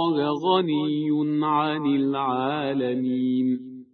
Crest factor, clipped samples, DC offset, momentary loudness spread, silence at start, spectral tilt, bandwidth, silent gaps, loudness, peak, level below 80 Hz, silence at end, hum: 16 dB; under 0.1%; under 0.1%; 3 LU; 0 s; -8.5 dB/octave; 6 kHz; none; -24 LUFS; -8 dBFS; -70 dBFS; 0.1 s; none